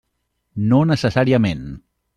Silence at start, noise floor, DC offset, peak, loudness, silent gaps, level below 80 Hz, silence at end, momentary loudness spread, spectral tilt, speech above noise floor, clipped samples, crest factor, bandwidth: 0.55 s; -72 dBFS; under 0.1%; -4 dBFS; -17 LUFS; none; -46 dBFS; 0.4 s; 16 LU; -7.5 dB/octave; 55 dB; under 0.1%; 16 dB; 11 kHz